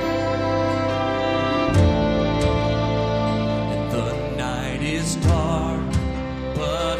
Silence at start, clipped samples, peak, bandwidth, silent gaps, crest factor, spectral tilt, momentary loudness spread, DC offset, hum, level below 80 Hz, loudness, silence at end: 0 s; under 0.1%; -6 dBFS; 14.5 kHz; none; 16 dB; -6 dB/octave; 6 LU; under 0.1%; none; -32 dBFS; -22 LUFS; 0 s